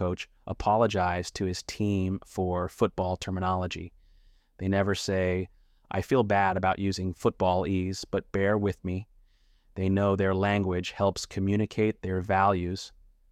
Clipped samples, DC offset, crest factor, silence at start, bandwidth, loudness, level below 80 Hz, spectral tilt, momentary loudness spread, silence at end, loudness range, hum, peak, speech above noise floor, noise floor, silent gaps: under 0.1%; under 0.1%; 18 dB; 0 s; 13 kHz; -28 LUFS; -52 dBFS; -6 dB/octave; 10 LU; 0.45 s; 3 LU; none; -10 dBFS; 34 dB; -62 dBFS; none